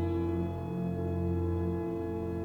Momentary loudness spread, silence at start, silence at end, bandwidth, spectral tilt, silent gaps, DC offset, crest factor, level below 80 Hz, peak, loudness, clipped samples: 3 LU; 0 s; 0 s; 4.5 kHz; -10 dB/octave; none; under 0.1%; 12 dB; -54 dBFS; -22 dBFS; -33 LUFS; under 0.1%